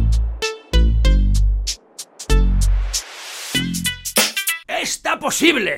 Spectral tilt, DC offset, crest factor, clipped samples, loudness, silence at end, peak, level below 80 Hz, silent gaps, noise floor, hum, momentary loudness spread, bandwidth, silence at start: -3.5 dB/octave; under 0.1%; 18 dB; under 0.1%; -19 LUFS; 0 s; 0 dBFS; -20 dBFS; none; -37 dBFS; none; 10 LU; 16.5 kHz; 0 s